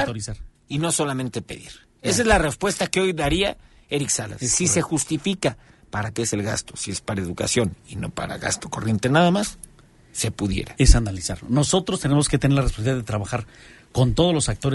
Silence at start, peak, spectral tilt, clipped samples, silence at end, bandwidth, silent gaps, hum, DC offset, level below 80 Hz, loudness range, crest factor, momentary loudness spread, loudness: 0 s; 0 dBFS; -4.5 dB/octave; under 0.1%; 0 s; 12 kHz; none; none; under 0.1%; -32 dBFS; 4 LU; 22 dB; 12 LU; -22 LUFS